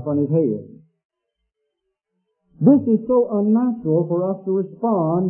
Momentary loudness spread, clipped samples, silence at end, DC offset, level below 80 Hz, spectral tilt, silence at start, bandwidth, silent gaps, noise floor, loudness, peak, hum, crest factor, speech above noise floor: 7 LU; under 0.1%; 0 s; under 0.1%; -62 dBFS; -16 dB/octave; 0 s; 2.6 kHz; 1.05-1.10 s; -78 dBFS; -19 LUFS; -2 dBFS; none; 18 dB; 59 dB